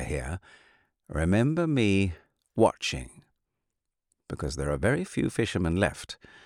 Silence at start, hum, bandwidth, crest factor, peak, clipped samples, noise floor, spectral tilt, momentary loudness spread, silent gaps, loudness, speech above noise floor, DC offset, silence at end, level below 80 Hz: 0 s; none; 14.5 kHz; 20 dB; -8 dBFS; under 0.1%; -83 dBFS; -6 dB/octave; 16 LU; none; -28 LUFS; 56 dB; under 0.1%; 0.3 s; -44 dBFS